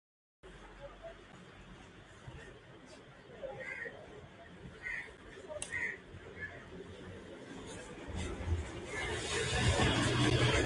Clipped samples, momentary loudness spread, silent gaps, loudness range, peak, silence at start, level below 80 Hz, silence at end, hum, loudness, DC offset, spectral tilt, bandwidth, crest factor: under 0.1%; 24 LU; none; 14 LU; -16 dBFS; 0.45 s; -48 dBFS; 0 s; none; -37 LUFS; under 0.1%; -4.5 dB/octave; 11.5 kHz; 22 dB